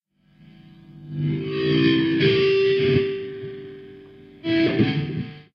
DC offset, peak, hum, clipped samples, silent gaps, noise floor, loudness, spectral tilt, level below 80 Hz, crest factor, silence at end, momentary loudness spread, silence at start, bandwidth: under 0.1%; -6 dBFS; none; under 0.1%; none; -53 dBFS; -21 LUFS; -8.5 dB/octave; -56 dBFS; 16 dB; 0.15 s; 17 LU; 0.9 s; 6.2 kHz